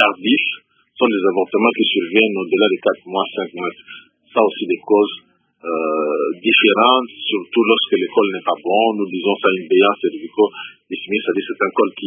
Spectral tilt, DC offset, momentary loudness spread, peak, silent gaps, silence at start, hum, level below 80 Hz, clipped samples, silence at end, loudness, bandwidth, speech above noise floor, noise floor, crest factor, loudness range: -8.5 dB/octave; under 0.1%; 9 LU; 0 dBFS; none; 0 s; none; -72 dBFS; under 0.1%; 0 s; -17 LUFS; 3.7 kHz; 19 dB; -36 dBFS; 18 dB; 4 LU